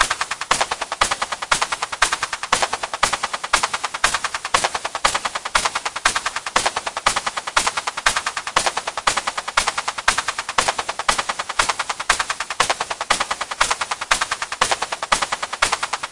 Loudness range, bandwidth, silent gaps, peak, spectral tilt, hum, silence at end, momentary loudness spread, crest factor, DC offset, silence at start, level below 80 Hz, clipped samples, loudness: 0 LU; 11.5 kHz; none; 0 dBFS; 0 dB/octave; none; 0 s; 4 LU; 22 dB; under 0.1%; 0 s; -44 dBFS; under 0.1%; -20 LUFS